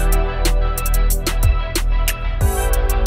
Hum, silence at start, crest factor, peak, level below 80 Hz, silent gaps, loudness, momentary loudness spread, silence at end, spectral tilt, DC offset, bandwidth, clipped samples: none; 0 s; 12 dB; -4 dBFS; -16 dBFS; none; -20 LUFS; 2 LU; 0 s; -4 dB/octave; under 0.1%; 16.5 kHz; under 0.1%